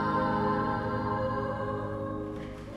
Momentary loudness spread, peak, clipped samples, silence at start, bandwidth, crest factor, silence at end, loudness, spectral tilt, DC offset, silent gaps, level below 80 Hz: 9 LU; -16 dBFS; under 0.1%; 0 s; 12 kHz; 14 dB; 0 s; -31 LUFS; -8 dB/octave; under 0.1%; none; -48 dBFS